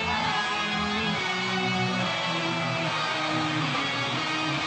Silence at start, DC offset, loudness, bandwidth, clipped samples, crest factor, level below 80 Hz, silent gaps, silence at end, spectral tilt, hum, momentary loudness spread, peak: 0 s; under 0.1%; -26 LUFS; 9 kHz; under 0.1%; 12 dB; -56 dBFS; none; 0 s; -4 dB/octave; none; 1 LU; -14 dBFS